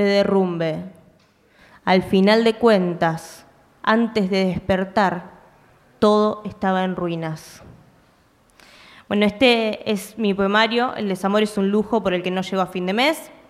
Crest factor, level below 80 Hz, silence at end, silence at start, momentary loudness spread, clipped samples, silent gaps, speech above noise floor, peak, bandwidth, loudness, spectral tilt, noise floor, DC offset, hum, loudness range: 18 dB; -54 dBFS; 0.2 s; 0 s; 9 LU; under 0.1%; none; 37 dB; -4 dBFS; 14.5 kHz; -20 LUFS; -6 dB/octave; -57 dBFS; under 0.1%; none; 4 LU